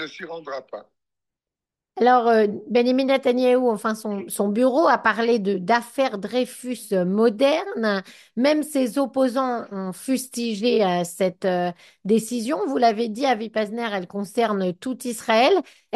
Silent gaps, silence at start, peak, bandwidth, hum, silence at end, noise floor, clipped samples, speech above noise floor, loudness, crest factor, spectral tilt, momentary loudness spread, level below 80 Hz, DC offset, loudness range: none; 0 s; -4 dBFS; 12.5 kHz; none; 0 s; -88 dBFS; under 0.1%; 66 dB; -22 LUFS; 18 dB; -5 dB/octave; 11 LU; -72 dBFS; under 0.1%; 3 LU